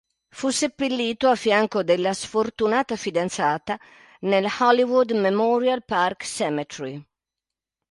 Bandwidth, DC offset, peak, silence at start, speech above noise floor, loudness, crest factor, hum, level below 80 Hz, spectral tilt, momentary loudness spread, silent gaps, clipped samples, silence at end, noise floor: 11.5 kHz; under 0.1%; -4 dBFS; 0.35 s; 66 dB; -22 LUFS; 20 dB; none; -64 dBFS; -4 dB/octave; 11 LU; none; under 0.1%; 0.9 s; -88 dBFS